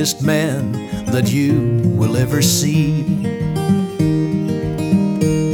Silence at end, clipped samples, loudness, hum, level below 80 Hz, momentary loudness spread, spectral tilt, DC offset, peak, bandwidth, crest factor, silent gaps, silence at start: 0 s; under 0.1%; -17 LUFS; none; -40 dBFS; 6 LU; -5.5 dB/octave; under 0.1%; -2 dBFS; 18.5 kHz; 14 dB; none; 0 s